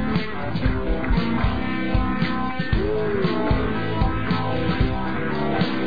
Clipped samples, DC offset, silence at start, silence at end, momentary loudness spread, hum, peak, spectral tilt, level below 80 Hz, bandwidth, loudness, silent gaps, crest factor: under 0.1%; 4%; 0 s; 0 s; 3 LU; none; -8 dBFS; -9 dB/octave; -30 dBFS; 5 kHz; -24 LUFS; none; 14 dB